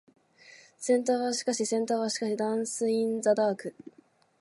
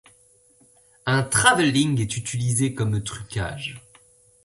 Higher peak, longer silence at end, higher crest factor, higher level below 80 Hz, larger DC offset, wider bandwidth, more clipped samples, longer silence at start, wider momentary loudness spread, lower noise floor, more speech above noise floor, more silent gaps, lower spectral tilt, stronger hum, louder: second, -12 dBFS vs -2 dBFS; second, 0.5 s vs 0.65 s; second, 16 dB vs 22 dB; second, -84 dBFS vs -50 dBFS; neither; about the same, 11.5 kHz vs 12 kHz; neither; second, 0.5 s vs 1.05 s; second, 4 LU vs 14 LU; about the same, -56 dBFS vs -57 dBFS; second, 27 dB vs 35 dB; neither; about the same, -3.5 dB/octave vs -4 dB/octave; neither; second, -28 LUFS vs -22 LUFS